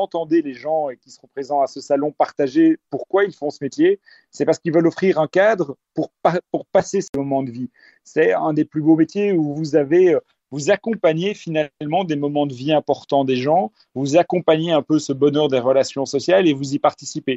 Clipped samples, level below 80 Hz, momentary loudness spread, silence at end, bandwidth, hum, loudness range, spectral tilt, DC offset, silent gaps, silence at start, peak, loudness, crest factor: under 0.1%; -64 dBFS; 9 LU; 0 s; 8.2 kHz; none; 3 LU; -6 dB/octave; under 0.1%; 7.09-7.13 s; 0 s; -2 dBFS; -19 LUFS; 16 dB